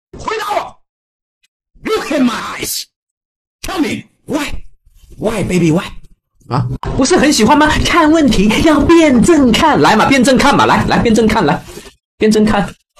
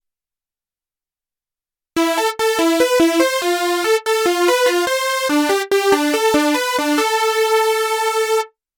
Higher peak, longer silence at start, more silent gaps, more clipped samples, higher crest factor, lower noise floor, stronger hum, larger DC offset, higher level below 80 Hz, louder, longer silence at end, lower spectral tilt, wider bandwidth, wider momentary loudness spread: about the same, -2 dBFS vs -2 dBFS; second, 0.15 s vs 1.95 s; first, 0.89-1.41 s, 1.48-1.60 s, 2.96-3.59 s, 12.05-12.18 s vs none; neither; about the same, 12 dB vs 16 dB; second, -41 dBFS vs under -90 dBFS; neither; neither; first, -30 dBFS vs -58 dBFS; first, -12 LUFS vs -16 LUFS; about the same, 0.25 s vs 0.3 s; first, -5 dB/octave vs -1.5 dB/octave; second, 13.5 kHz vs 18 kHz; first, 13 LU vs 3 LU